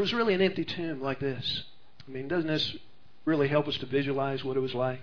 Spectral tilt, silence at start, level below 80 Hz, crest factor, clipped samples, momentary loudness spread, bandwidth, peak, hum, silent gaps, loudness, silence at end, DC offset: -6.5 dB/octave; 0 s; -62 dBFS; 18 dB; under 0.1%; 9 LU; 5.4 kHz; -12 dBFS; none; none; -30 LUFS; 0 s; 0.6%